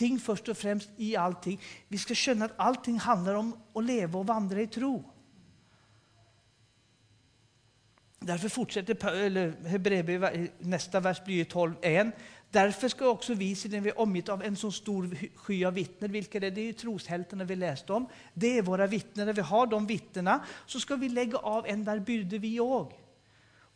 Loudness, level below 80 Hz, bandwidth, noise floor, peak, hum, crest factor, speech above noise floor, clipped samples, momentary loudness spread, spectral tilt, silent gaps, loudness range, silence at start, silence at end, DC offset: -31 LUFS; -70 dBFS; 10.5 kHz; -66 dBFS; -10 dBFS; none; 22 dB; 36 dB; under 0.1%; 8 LU; -5 dB/octave; none; 6 LU; 0 s; 0.8 s; under 0.1%